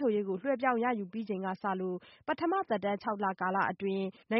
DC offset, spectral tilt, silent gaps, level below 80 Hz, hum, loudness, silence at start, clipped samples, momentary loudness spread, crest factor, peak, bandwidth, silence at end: under 0.1%; -5 dB/octave; none; -76 dBFS; none; -33 LUFS; 0 s; under 0.1%; 7 LU; 18 dB; -16 dBFS; 5.8 kHz; 0 s